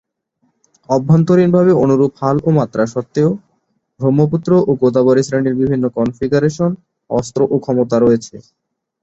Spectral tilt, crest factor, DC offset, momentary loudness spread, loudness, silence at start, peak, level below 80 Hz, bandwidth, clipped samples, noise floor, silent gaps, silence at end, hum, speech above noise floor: -8 dB/octave; 14 dB; under 0.1%; 8 LU; -14 LUFS; 0.9 s; -2 dBFS; -50 dBFS; 8.2 kHz; under 0.1%; -65 dBFS; none; 0.65 s; none; 51 dB